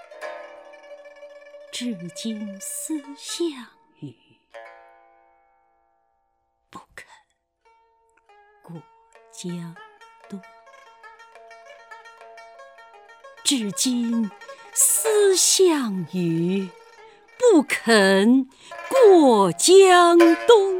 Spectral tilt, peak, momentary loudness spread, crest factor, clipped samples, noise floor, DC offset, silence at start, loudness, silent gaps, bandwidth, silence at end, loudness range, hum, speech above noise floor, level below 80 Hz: -3.5 dB/octave; 0 dBFS; 25 LU; 22 dB; under 0.1%; -71 dBFS; under 0.1%; 0.2 s; -18 LUFS; none; 18 kHz; 0 s; 24 LU; none; 53 dB; -74 dBFS